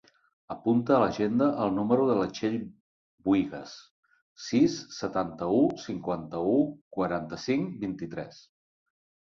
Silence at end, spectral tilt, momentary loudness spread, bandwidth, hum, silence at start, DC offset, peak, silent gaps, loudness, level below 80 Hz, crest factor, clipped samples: 0.9 s; -6.5 dB/octave; 15 LU; 7.4 kHz; none; 0.5 s; under 0.1%; -10 dBFS; 2.80-3.18 s, 3.91-4.03 s, 4.22-4.36 s, 6.81-6.91 s; -28 LUFS; -62 dBFS; 18 dB; under 0.1%